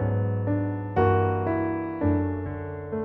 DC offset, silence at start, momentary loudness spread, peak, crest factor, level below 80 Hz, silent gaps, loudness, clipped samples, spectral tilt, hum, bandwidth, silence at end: under 0.1%; 0 s; 10 LU; -10 dBFS; 16 dB; -48 dBFS; none; -26 LUFS; under 0.1%; -11.5 dB/octave; none; 3.2 kHz; 0 s